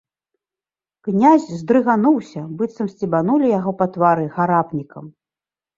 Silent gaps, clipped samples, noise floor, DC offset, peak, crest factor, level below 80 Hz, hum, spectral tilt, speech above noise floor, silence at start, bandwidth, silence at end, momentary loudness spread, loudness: none; under 0.1%; under -90 dBFS; under 0.1%; -2 dBFS; 18 dB; -62 dBFS; none; -8.5 dB/octave; over 73 dB; 1.05 s; 7.6 kHz; 0.65 s; 12 LU; -18 LUFS